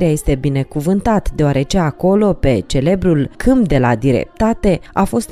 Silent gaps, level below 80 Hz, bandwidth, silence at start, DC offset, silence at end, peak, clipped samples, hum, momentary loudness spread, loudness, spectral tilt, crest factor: none; -26 dBFS; 15 kHz; 0 s; under 0.1%; 0.05 s; -2 dBFS; under 0.1%; none; 4 LU; -15 LUFS; -7 dB/octave; 12 dB